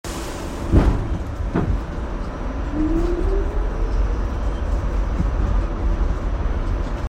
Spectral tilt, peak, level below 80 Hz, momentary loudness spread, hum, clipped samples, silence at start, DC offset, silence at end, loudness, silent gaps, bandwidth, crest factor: -7.5 dB/octave; -2 dBFS; -22 dBFS; 8 LU; none; under 0.1%; 0.05 s; under 0.1%; 0 s; -24 LUFS; none; 10 kHz; 18 dB